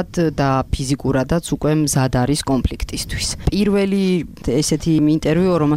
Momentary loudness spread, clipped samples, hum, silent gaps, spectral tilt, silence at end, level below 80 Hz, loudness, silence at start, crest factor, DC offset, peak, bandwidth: 6 LU; under 0.1%; none; none; -5.5 dB/octave; 0 s; -30 dBFS; -18 LUFS; 0 s; 14 dB; under 0.1%; -4 dBFS; 16 kHz